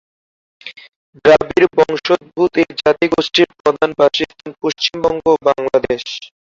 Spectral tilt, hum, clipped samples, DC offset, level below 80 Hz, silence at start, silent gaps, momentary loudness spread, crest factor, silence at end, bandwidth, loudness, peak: -4.5 dB/octave; none; under 0.1%; under 0.1%; -50 dBFS; 0.65 s; 0.96-1.13 s, 3.60-3.64 s; 12 LU; 14 dB; 0.25 s; 7.6 kHz; -15 LUFS; 0 dBFS